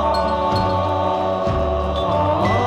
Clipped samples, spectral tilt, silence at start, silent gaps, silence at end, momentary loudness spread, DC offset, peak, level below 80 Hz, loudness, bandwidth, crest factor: under 0.1%; -7 dB/octave; 0 s; none; 0 s; 2 LU; under 0.1%; -6 dBFS; -32 dBFS; -19 LUFS; 11 kHz; 12 dB